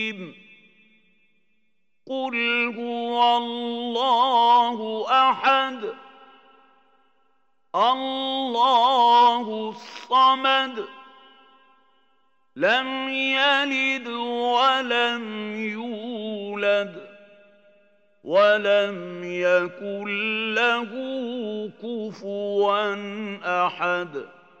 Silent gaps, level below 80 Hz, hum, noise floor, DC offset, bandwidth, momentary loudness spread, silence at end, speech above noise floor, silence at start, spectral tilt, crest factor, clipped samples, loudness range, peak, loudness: none; -88 dBFS; none; -75 dBFS; under 0.1%; 8.2 kHz; 14 LU; 0.35 s; 53 dB; 0 s; -4 dB/octave; 18 dB; under 0.1%; 6 LU; -6 dBFS; -22 LUFS